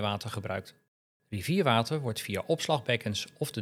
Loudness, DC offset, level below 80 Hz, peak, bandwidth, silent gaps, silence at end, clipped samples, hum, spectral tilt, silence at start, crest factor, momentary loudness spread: -31 LUFS; under 0.1%; -72 dBFS; -8 dBFS; 16.5 kHz; 0.88-1.20 s; 0 s; under 0.1%; none; -5 dB/octave; 0 s; 22 dB; 11 LU